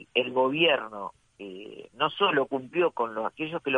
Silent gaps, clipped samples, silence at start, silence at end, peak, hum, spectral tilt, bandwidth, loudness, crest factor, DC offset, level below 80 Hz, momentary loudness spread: none; under 0.1%; 0 s; 0 s; -10 dBFS; none; -6 dB/octave; 9.4 kHz; -26 LUFS; 18 dB; under 0.1%; -72 dBFS; 20 LU